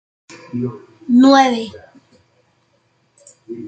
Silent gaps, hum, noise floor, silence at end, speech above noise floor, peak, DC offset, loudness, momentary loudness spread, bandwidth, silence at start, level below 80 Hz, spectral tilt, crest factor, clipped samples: none; none; -61 dBFS; 0 s; 47 dB; 0 dBFS; under 0.1%; -14 LUFS; 23 LU; 8.6 kHz; 0.55 s; -66 dBFS; -5 dB/octave; 18 dB; under 0.1%